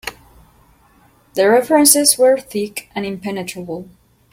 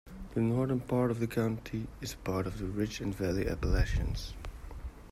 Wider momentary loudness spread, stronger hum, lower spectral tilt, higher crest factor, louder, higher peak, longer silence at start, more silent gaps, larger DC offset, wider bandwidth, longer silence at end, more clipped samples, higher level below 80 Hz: first, 19 LU vs 14 LU; neither; second, -2.5 dB/octave vs -6.5 dB/octave; about the same, 18 dB vs 16 dB; first, -15 LUFS vs -34 LUFS; first, 0 dBFS vs -16 dBFS; about the same, 0.05 s vs 0.05 s; neither; neither; about the same, 16.5 kHz vs 15.5 kHz; first, 0.5 s vs 0 s; neither; second, -54 dBFS vs -40 dBFS